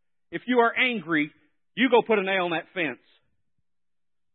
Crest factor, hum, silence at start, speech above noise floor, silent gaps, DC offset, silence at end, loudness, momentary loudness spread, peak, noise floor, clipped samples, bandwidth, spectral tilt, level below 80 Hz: 20 dB; none; 0.3 s; over 66 dB; none; under 0.1%; 1.4 s; -24 LUFS; 16 LU; -8 dBFS; under -90 dBFS; under 0.1%; 4.3 kHz; -9 dB/octave; -78 dBFS